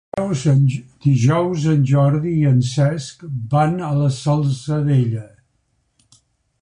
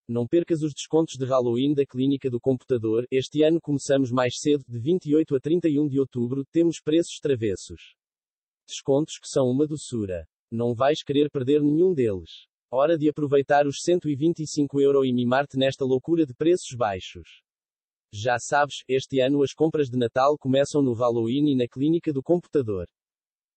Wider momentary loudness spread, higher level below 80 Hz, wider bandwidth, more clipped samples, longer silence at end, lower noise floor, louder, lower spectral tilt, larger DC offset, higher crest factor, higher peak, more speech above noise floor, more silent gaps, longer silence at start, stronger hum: about the same, 7 LU vs 7 LU; first, -50 dBFS vs -62 dBFS; first, 10 kHz vs 8.8 kHz; neither; first, 1.35 s vs 0.7 s; second, -66 dBFS vs under -90 dBFS; first, -18 LUFS vs -24 LUFS; first, -7.5 dB/octave vs -6 dB/octave; neither; about the same, 14 dB vs 14 dB; first, -4 dBFS vs -8 dBFS; second, 49 dB vs over 67 dB; second, none vs 6.48-6.52 s, 8.29-8.67 s, 10.33-10.48 s, 12.49-12.69 s, 17.76-18.05 s; about the same, 0.15 s vs 0.1 s; neither